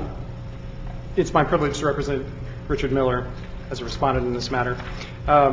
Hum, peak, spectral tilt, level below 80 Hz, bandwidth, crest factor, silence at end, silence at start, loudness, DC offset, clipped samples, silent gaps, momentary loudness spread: none; -4 dBFS; -6 dB/octave; -36 dBFS; 7.8 kHz; 18 dB; 0 s; 0 s; -24 LUFS; under 0.1%; under 0.1%; none; 16 LU